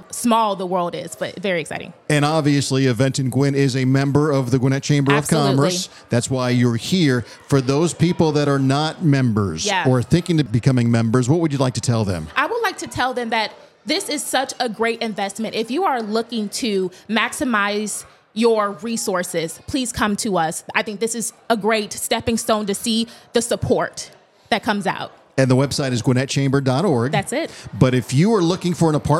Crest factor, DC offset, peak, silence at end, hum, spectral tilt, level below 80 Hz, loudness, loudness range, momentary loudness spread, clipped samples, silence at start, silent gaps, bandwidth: 20 dB; under 0.1%; 0 dBFS; 0 s; none; -5 dB/octave; -52 dBFS; -19 LUFS; 4 LU; 7 LU; under 0.1%; 0 s; none; 15.5 kHz